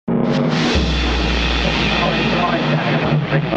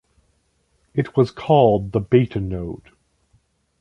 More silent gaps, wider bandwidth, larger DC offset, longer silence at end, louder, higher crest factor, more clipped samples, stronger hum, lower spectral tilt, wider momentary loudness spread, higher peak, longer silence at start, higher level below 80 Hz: neither; first, 8.4 kHz vs 7 kHz; neither; second, 0 s vs 1.05 s; about the same, -17 LUFS vs -19 LUFS; second, 14 dB vs 20 dB; neither; neither; second, -6 dB/octave vs -9 dB/octave; second, 2 LU vs 14 LU; about the same, -2 dBFS vs -2 dBFS; second, 0.05 s vs 0.95 s; first, -26 dBFS vs -44 dBFS